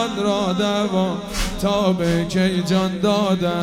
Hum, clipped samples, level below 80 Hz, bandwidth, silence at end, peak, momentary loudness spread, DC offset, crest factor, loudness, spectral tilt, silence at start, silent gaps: none; under 0.1%; -36 dBFS; 15.5 kHz; 0 s; -6 dBFS; 4 LU; under 0.1%; 14 dB; -20 LUFS; -5.5 dB/octave; 0 s; none